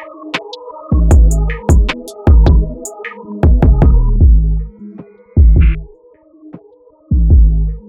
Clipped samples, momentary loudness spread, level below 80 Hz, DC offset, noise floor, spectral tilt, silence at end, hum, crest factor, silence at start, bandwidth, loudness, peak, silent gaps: under 0.1%; 16 LU; -12 dBFS; under 0.1%; -45 dBFS; -7 dB/octave; 0.1 s; none; 10 dB; 0 s; 9.4 kHz; -12 LUFS; 0 dBFS; none